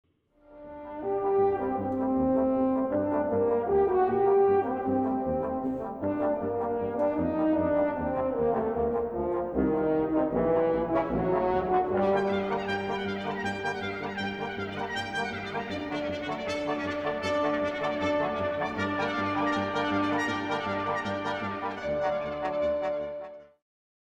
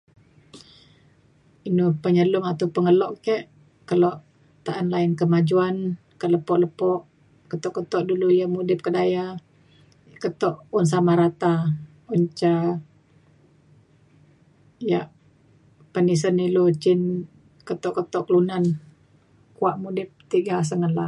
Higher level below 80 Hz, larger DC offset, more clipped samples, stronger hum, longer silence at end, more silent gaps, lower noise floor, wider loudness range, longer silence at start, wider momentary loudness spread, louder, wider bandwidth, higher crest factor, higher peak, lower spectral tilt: first, -52 dBFS vs -66 dBFS; neither; neither; neither; first, 0.7 s vs 0 s; neither; about the same, -59 dBFS vs -58 dBFS; about the same, 6 LU vs 5 LU; about the same, 0.5 s vs 0.55 s; second, 7 LU vs 12 LU; second, -28 LUFS vs -23 LUFS; second, 9.2 kHz vs 11 kHz; about the same, 16 dB vs 16 dB; second, -14 dBFS vs -8 dBFS; about the same, -6.5 dB/octave vs -7.5 dB/octave